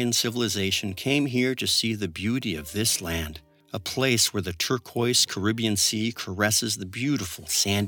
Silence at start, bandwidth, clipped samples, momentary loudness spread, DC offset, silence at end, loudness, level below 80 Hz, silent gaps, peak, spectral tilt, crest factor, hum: 0 s; 19 kHz; under 0.1%; 8 LU; under 0.1%; 0 s; -24 LUFS; -52 dBFS; none; -8 dBFS; -3 dB/octave; 18 dB; none